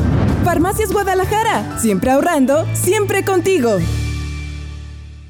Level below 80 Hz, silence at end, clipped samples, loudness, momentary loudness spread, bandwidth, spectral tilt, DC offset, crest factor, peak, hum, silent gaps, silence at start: -30 dBFS; 0 s; under 0.1%; -16 LUFS; 13 LU; over 20 kHz; -5.5 dB/octave; under 0.1%; 10 dB; -6 dBFS; none; none; 0 s